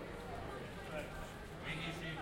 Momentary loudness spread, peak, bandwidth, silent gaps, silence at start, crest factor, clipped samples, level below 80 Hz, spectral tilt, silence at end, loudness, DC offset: 5 LU; -30 dBFS; 16.5 kHz; none; 0 s; 16 dB; under 0.1%; -56 dBFS; -5 dB/octave; 0 s; -46 LUFS; under 0.1%